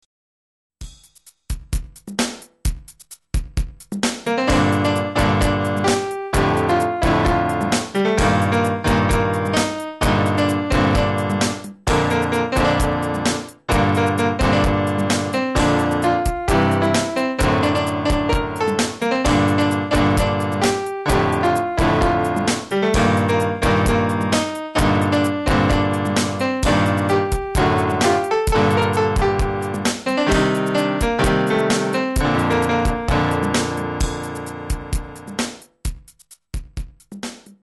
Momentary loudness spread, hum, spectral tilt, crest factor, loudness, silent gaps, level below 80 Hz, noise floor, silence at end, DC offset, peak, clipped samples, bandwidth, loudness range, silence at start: 11 LU; none; -5.5 dB/octave; 14 dB; -19 LUFS; none; -30 dBFS; -51 dBFS; 0.25 s; under 0.1%; -6 dBFS; under 0.1%; 12 kHz; 5 LU; 0.8 s